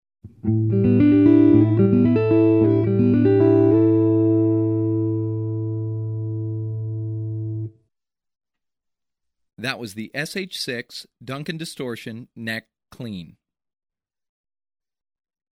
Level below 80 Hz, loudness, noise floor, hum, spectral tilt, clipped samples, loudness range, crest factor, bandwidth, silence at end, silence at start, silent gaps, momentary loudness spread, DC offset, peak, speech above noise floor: -54 dBFS; -20 LUFS; -84 dBFS; none; -8 dB/octave; under 0.1%; 17 LU; 18 dB; 13 kHz; 2.25 s; 0.25 s; none; 17 LU; under 0.1%; -4 dBFS; 57 dB